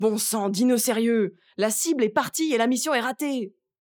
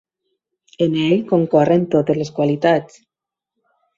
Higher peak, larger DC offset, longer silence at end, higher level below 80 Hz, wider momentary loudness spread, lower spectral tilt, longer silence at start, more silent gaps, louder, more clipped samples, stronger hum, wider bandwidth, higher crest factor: second, -6 dBFS vs -2 dBFS; neither; second, 0.35 s vs 1.1 s; second, -78 dBFS vs -60 dBFS; about the same, 7 LU vs 6 LU; second, -3.5 dB/octave vs -7.5 dB/octave; second, 0 s vs 0.8 s; neither; second, -24 LUFS vs -17 LUFS; neither; neither; first, over 20 kHz vs 7.6 kHz; about the same, 16 dB vs 16 dB